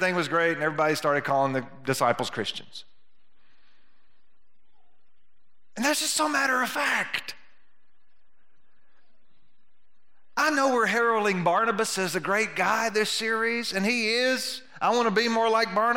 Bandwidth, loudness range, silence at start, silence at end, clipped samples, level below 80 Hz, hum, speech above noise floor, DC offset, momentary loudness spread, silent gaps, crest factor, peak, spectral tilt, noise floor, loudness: 16.5 kHz; 9 LU; 0 s; 0 s; under 0.1%; -76 dBFS; none; 51 dB; 0.5%; 8 LU; none; 20 dB; -8 dBFS; -3 dB/octave; -76 dBFS; -25 LUFS